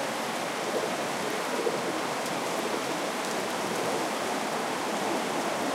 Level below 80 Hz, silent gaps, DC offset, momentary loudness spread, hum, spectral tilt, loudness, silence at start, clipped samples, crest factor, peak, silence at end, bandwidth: -74 dBFS; none; under 0.1%; 1 LU; none; -3 dB/octave; -30 LUFS; 0 s; under 0.1%; 16 dB; -16 dBFS; 0 s; 16.5 kHz